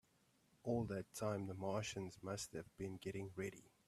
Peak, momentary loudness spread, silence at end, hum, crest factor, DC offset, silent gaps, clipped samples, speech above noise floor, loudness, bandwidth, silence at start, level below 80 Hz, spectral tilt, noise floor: -28 dBFS; 7 LU; 0.2 s; none; 18 dB; under 0.1%; none; under 0.1%; 31 dB; -46 LUFS; 15 kHz; 0.65 s; -72 dBFS; -5.5 dB/octave; -77 dBFS